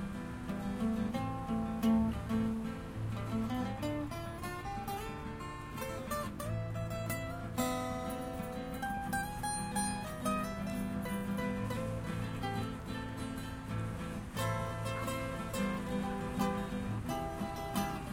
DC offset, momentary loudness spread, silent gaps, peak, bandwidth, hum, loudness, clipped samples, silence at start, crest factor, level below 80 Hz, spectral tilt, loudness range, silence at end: under 0.1%; 6 LU; none; -20 dBFS; 16.5 kHz; none; -38 LUFS; under 0.1%; 0 s; 16 dB; -50 dBFS; -5.5 dB/octave; 4 LU; 0 s